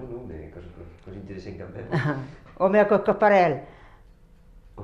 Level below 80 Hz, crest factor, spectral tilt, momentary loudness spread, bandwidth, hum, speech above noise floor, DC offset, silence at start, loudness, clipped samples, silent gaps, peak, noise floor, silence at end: -50 dBFS; 18 dB; -8 dB/octave; 24 LU; 7.4 kHz; none; 28 dB; under 0.1%; 0 s; -22 LUFS; under 0.1%; none; -8 dBFS; -52 dBFS; 0 s